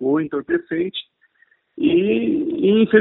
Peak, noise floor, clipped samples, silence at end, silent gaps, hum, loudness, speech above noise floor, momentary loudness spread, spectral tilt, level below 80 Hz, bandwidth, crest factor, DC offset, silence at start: -2 dBFS; -60 dBFS; under 0.1%; 0 s; none; none; -19 LUFS; 42 dB; 8 LU; -11 dB/octave; -58 dBFS; 4.1 kHz; 18 dB; under 0.1%; 0 s